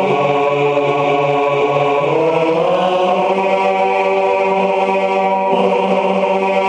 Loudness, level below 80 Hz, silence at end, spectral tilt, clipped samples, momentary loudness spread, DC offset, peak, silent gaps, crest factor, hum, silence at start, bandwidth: -14 LUFS; -60 dBFS; 0 s; -6 dB/octave; under 0.1%; 1 LU; under 0.1%; -2 dBFS; none; 12 dB; none; 0 s; 9.4 kHz